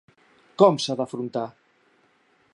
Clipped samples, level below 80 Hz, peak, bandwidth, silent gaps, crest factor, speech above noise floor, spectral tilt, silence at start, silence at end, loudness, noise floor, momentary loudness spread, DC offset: under 0.1%; -78 dBFS; -2 dBFS; 11 kHz; none; 24 dB; 41 dB; -5.5 dB/octave; 0.6 s; 1.05 s; -23 LUFS; -63 dBFS; 17 LU; under 0.1%